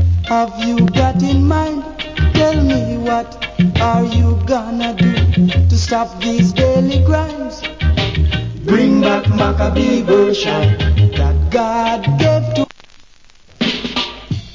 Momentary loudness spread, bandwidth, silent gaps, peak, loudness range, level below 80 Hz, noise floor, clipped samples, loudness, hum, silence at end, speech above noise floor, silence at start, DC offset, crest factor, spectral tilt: 7 LU; 7.6 kHz; none; 0 dBFS; 2 LU; -22 dBFS; -43 dBFS; under 0.1%; -15 LUFS; none; 0 s; 30 dB; 0 s; under 0.1%; 14 dB; -6.5 dB/octave